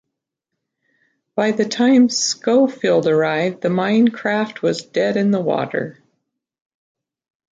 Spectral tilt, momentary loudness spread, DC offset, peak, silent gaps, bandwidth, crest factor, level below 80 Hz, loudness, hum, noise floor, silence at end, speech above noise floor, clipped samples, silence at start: -4.5 dB/octave; 7 LU; under 0.1%; -4 dBFS; none; 9.2 kHz; 16 dB; -66 dBFS; -18 LUFS; none; -80 dBFS; 1.6 s; 63 dB; under 0.1%; 1.35 s